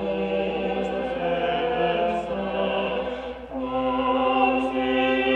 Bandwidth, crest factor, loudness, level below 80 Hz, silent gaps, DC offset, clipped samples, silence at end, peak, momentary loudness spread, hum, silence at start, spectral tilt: 8.4 kHz; 16 dB; -25 LUFS; -48 dBFS; none; under 0.1%; under 0.1%; 0 s; -8 dBFS; 8 LU; none; 0 s; -6.5 dB/octave